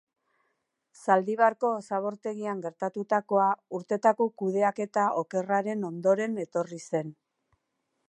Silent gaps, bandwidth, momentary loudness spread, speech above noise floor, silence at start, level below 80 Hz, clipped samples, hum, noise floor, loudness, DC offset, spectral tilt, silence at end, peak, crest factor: none; 11.5 kHz; 9 LU; 52 dB; 1 s; -84 dBFS; under 0.1%; none; -79 dBFS; -28 LUFS; under 0.1%; -6.5 dB/octave; 0.95 s; -8 dBFS; 20 dB